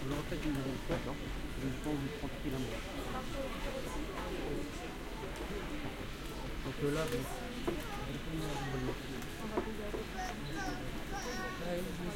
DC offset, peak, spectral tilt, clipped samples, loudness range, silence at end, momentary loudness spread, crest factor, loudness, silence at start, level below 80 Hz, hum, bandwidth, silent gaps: under 0.1%; -22 dBFS; -5 dB/octave; under 0.1%; 2 LU; 0 s; 5 LU; 16 dB; -40 LUFS; 0 s; -46 dBFS; none; 16.5 kHz; none